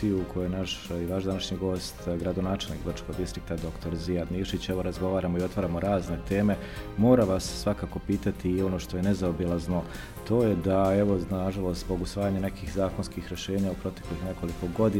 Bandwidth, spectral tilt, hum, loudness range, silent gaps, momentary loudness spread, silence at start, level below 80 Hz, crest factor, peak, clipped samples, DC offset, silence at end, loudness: 16.5 kHz; -6.5 dB/octave; none; 5 LU; none; 10 LU; 0 s; -42 dBFS; 20 dB; -8 dBFS; under 0.1%; 0.1%; 0 s; -29 LUFS